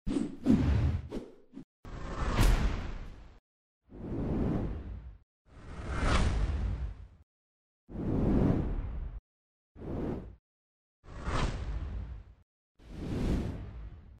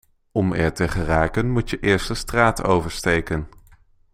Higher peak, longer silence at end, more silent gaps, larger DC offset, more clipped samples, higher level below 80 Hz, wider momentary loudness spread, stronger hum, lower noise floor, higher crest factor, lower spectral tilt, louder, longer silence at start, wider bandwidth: second, -12 dBFS vs -2 dBFS; second, 0.15 s vs 0.65 s; first, 1.64-1.83 s, 3.39-3.81 s, 5.23-5.45 s, 7.23-7.87 s, 9.19-9.75 s, 10.39-11.03 s, 12.43-12.75 s vs none; neither; neither; about the same, -38 dBFS vs -34 dBFS; first, 22 LU vs 8 LU; neither; first, under -90 dBFS vs -53 dBFS; about the same, 22 dB vs 20 dB; first, -7 dB/octave vs -5.5 dB/octave; second, -34 LUFS vs -21 LUFS; second, 0.05 s vs 0.35 s; about the same, 15 kHz vs 16 kHz